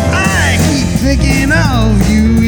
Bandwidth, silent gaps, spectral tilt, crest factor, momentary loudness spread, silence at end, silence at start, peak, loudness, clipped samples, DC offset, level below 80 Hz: over 20 kHz; none; -5 dB/octave; 10 dB; 2 LU; 0 s; 0 s; 0 dBFS; -11 LUFS; under 0.1%; under 0.1%; -16 dBFS